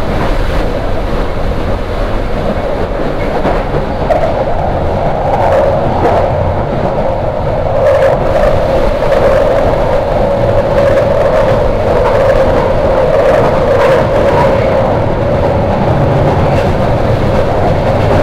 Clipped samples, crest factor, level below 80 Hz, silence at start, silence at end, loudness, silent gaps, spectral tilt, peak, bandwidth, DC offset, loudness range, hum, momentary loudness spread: under 0.1%; 10 dB; -18 dBFS; 0 s; 0 s; -11 LUFS; none; -7.5 dB/octave; 0 dBFS; 13.5 kHz; under 0.1%; 5 LU; none; 7 LU